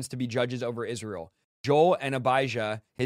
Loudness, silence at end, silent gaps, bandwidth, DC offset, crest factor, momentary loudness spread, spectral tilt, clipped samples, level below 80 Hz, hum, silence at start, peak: -27 LUFS; 0 s; 1.44-1.64 s; 14.5 kHz; under 0.1%; 18 dB; 14 LU; -5.5 dB/octave; under 0.1%; -68 dBFS; none; 0 s; -10 dBFS